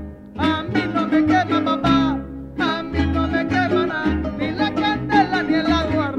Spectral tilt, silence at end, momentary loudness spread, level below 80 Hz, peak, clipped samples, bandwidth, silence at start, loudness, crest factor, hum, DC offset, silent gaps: -6.5 dB/octave; 0 s; 6 LU; -36 dBFS; -4 dBFS; under 0.1%; 7.8 kHz; 0 s; -20 LUFS; 16 dB; none; under 0.1%; none